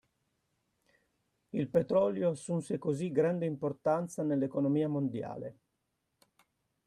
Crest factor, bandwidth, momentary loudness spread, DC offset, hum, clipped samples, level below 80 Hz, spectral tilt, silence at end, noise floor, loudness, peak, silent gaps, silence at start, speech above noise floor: 20 dB; 12 kHz; 10 LU; under 0.1%; none; under 0.1%; -74 dBFS; -8 dB/octave; 1.35 s; -82 dBFS; -32 LUFS; -14 dBFS; none; 1.55 s; 50 dB